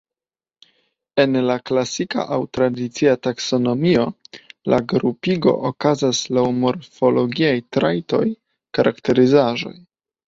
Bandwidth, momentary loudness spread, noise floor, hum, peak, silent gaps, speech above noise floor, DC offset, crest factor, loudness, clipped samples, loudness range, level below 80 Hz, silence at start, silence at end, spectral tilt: 7.8 kHz; 7 LU; under -90 dBFS; none; -2 dBFS; none; over 72 dB; under 0.1%; 18 dB; -19 LUFS; under 0.1%; 2 LU; -56 dBFS; 1.15 s; 0.55 s; -5.5 dB/octave